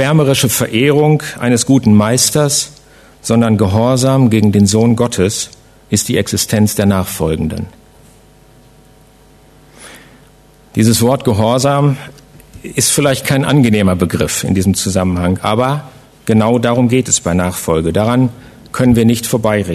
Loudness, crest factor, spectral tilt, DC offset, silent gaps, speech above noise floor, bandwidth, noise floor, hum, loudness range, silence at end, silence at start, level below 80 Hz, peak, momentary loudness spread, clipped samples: -12 LUFS; 14 dB; -5 dB/octave; under 0.1%; none; 32 dB; 14 kHz; -44 dBFS; none; 6 LU; 0 s; 0 s; -40 dBFS; 0 dBFS; 7 LU; under 0.1%